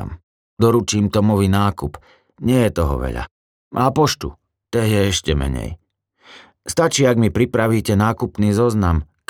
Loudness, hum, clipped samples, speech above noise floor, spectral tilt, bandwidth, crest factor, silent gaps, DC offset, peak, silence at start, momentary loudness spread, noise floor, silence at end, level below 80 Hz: -18 LUFS; none; under 0.1%; 37 dB; -5.5 dB/octave; 17 kHz; 16 dB; 0.23-0.57 s, 3.31-3.71 s; under 0.1%; -2 dBFS; 0 s; 13 LU; -54 dBFS; 0.25 s; -34 dBFS